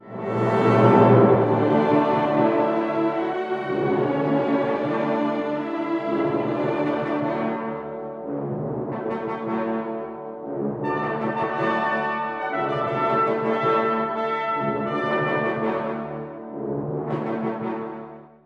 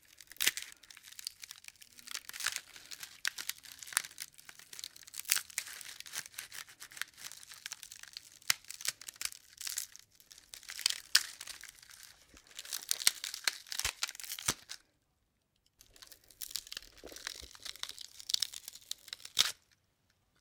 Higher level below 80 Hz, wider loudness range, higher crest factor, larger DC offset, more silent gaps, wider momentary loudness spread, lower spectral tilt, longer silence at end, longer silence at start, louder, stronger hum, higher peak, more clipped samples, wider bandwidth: first, -62 dBFS vs -70 dBFS; about the same, 8 LU vs 7 LU; second, 20 dB vs 38 dB; neither; neither; second, 12 LU vs 20 LU; first, -8.5 dB/octave vs 2 dB/octave; second, 0.2 s vs 0.85 s; second, 0.05 s vs 0.3 s; first, -23 LUFS vs -37 LUFS; neither; about the same, -2 dBFS vs -2 dBFS; neither; second, 7.6 kHz vs 18 kHz